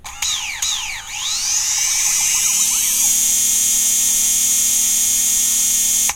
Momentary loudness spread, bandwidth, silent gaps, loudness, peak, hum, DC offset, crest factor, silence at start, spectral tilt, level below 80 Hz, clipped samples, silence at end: 7 LU; 16.5 kHz; none; -14 LUFS; -2 dBFS; none; under 0.1%; 14 dB; 0.05 s; 2.5 dB/octave; -46 dBFS; under 0.1%; 0 s